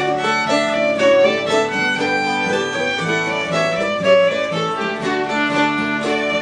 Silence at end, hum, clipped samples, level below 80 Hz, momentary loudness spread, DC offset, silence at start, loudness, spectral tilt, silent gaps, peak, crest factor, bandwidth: 0 s; none; under 0.1%; -56 dBFS; 6 LU; under 0.1%; 0 s; -17 LUFS; -4 dB/octave; none; -2 dBFS; 16 dB; 10.5 kHz